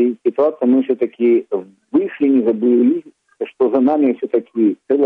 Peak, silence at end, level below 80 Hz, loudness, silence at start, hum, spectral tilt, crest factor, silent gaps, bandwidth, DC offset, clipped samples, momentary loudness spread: -4 dBFS; 0 s; -66 dBFS; -16 LUFS; 0 s; none; -9.5 dB/octave; 12 dB; none; 3.8 kHz; under 0.1%; under 0.1%; 8 LU